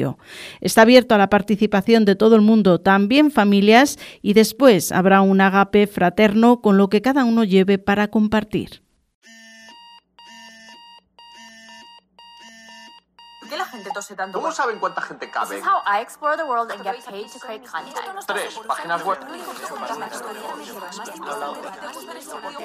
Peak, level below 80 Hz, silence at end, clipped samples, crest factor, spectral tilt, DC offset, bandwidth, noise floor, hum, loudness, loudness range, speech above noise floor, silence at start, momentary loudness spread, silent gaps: 0 dBFS; -54 dBFS; 0 s; under 0.1%; 18 dB; -5.5 dB/octave; under 0.1%; 15.5 kHz; -47 dBFS; none; -17 LUFS; 16 LU; 29 dB; 0 s; 20 LU; 9.15-9.22 s